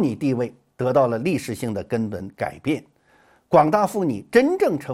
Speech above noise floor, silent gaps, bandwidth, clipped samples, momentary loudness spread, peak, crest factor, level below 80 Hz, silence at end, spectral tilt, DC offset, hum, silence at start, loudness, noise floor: 37 dB; none; 16 kHz; under 0.1%; 11 LU; -2 dBFS; 20 dB; -58 dBFS; 0 s; -7 dB/octave; under 0.1%; none; 0 s; -22 LUFS; -58 dBFS